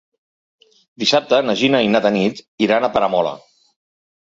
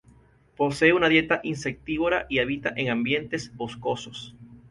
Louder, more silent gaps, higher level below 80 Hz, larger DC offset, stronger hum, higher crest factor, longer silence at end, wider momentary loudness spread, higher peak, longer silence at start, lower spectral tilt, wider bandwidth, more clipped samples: first, -17 LUFS vs -25 LUFS; first, 2.48-2.58 s vs none; about the same, -58 dBFS vs -54 dBFS; neither; neither; about the same, 16 dB vs 20 dB; first, 0.85 s vs 0.15 s; second, 7 LU vs 13 LU; first, -2 dBFS vs -6 dBFS; first, 1 s vs 0.6 s; about the same, -4.5 dB/octave vs -5 dB/octave; second, 7.8 kHz vs 11.5 kHz; neither